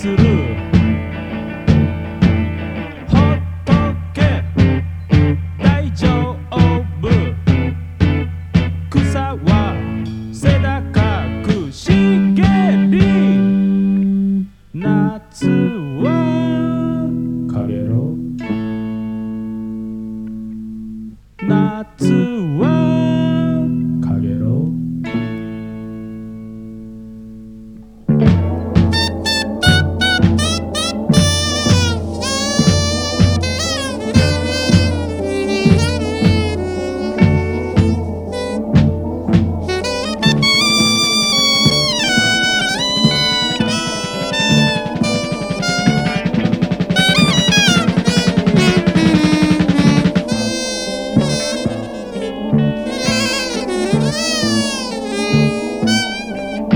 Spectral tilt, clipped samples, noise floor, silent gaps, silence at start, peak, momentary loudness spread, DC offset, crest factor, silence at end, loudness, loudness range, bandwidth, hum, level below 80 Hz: -5 dB/octave; under 0.1%; -36 dBFS; none; 0 s; 0 dBFS; 12 LU; under 0.1%; 16 dB; 0 s; -15 LUFS; 7 LU; over 20 kHz; 50 Hz at -40 dBFS; -32 dBFS